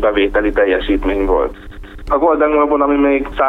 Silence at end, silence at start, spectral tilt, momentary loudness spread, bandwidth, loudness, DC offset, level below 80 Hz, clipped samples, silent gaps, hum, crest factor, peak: 0 s; 0 s; -7.5 dB/octave; 5 LU; 4.5 kHz; -14 LUFS; under 0.1%; -28 dBFS; under 0.1%; none; none; 12 dB; -2 dBFS